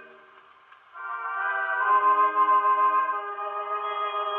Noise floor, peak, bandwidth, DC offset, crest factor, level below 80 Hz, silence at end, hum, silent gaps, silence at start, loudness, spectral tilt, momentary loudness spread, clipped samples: -54 dBFS; -12 dBFS; 3.8 kHz; under 0.1%; 14 dB; under -90 dBFS; 0 s; none; none; 0 s; -24 LUFS; -3.5 dB/octave; 11 LU; under 0.1%